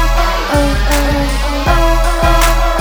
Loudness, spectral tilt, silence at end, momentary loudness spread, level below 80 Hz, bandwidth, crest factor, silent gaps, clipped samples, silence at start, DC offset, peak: -13 LUFS; -4.5 dB/octave; 0 s; 4 LU; -14 dBFS; over 20 kHz; 12 dB; none; under 0.1%; 0 s; under 0.1%; 0 dBFS